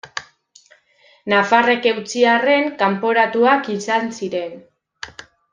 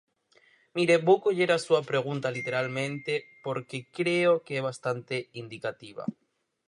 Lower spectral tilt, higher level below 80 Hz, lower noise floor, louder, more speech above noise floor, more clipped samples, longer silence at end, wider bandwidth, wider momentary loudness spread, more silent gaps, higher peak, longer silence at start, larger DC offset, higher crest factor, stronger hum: second, -4 dB/octave vs -5.5 dB/octave; first, -66 dBFS vs -76 dBFS; second, -54 dBFS vs -64 dBFS; first, -17 LUFS vs -28 LUFS; about the same, 37 dB vs 36 dB; neither; about the same, 0.45 s vs 0.55 s; second, 9.8 kHz vs 11.5 kHz; first, 20 LU vs 14 LU; neither; first, -2 dBFS vs -10 dBFS; second, 0.05 s vs 0.75 s; neither; about the same, 18 dB vs 18 dB; neither